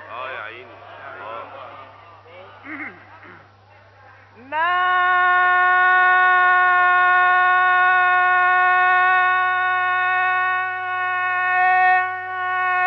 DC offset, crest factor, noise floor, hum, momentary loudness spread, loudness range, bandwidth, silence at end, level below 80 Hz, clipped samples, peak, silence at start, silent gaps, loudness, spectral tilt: under 0.1%; 12 dB; -49 dBFS; none; 19 LU; 21 LU; 5.8 kHz; 0 s; -72 dBFS; under 0.1%; -6 dBFS; 0 s; none; -16 LUFS; 1 dB/octave